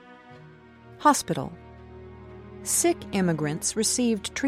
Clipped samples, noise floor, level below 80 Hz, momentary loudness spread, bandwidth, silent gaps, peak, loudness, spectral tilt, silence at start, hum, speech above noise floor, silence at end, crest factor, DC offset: under 0.1%; -49 dBFS; -54 dBFS; 23 LU; 16 kHz; none; -6 dBFS; -25 LUFS; -3.5 dB/octave; 0.05 s; none; 25 dB; 0 s; 22 dB; under 0.1%